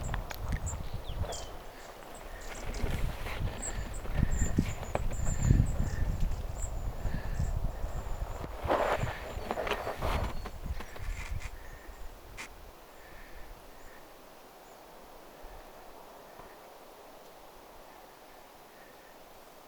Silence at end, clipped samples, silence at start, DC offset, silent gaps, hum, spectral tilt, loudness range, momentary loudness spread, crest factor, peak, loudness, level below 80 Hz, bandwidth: 0 s; under 0.1%; 0 s; under 0.1%; none; none; -5.5 dB/octave; 18 LU; 20 LU; 26 dB; -8 dBFS; -36 LUFS; -38 dBFS; over 20 kHz